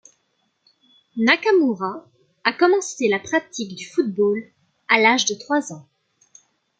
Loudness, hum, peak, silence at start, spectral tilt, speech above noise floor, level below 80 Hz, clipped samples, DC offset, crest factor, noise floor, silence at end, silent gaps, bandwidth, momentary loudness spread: -20 LUFS; none; 0 dBFS; 1.15 s; -3 dB/octave; 49 dB; -72 dBFS; under 0.1%; under 0.1%; 22 dB; -69 dBFS; 1 s; none; 9.4 kHz; 15 LU